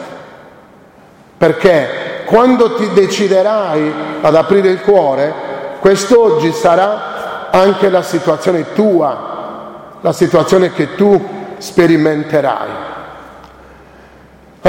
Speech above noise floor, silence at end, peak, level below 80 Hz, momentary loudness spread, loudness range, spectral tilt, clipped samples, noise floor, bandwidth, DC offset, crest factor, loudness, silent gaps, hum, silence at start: 31 dB; 0 s; 0 dBFS; -48 dBFS; 15 LU; 3 LU; -6 dB/octave; under 0.1%; -42 dBFS; 16.5 kHz; under 0.1%; 12 dB; -12 LUFS; none; none; 0 s